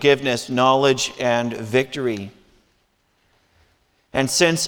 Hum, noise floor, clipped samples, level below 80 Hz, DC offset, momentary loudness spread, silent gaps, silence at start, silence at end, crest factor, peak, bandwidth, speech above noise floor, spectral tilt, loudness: none; -65 dBFS; under 0.1%; -58 dBFS; under 0.1%; 10 LU; none; 0 s; 0 s; 20 dB; -2 dBFS; 20 kHz; 46 dB; -3.5 dB/octave; -20 LUFS